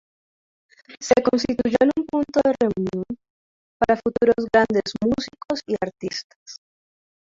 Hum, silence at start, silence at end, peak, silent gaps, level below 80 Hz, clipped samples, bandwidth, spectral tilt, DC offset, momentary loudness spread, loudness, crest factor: none; 0.9 s; 0.8 s; -4 dBFS; 3.30-3.80 s, 6.24-6.46 s; -52 dBFS; under 0.1%; 7.8 kHz; -5 dB/octave; under 0.1%; 15 LU; -21 LUFS; 20 dB